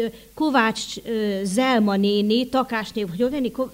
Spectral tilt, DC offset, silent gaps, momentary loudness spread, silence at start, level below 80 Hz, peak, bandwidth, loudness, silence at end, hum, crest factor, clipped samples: -5 dB/octave; under 0.1%; none; 8 LU; 0 s; -54 dBFS; -6 dBFS; 16 kHz; -22 LUFS; 0 s; none; 16 dB; under 0.1%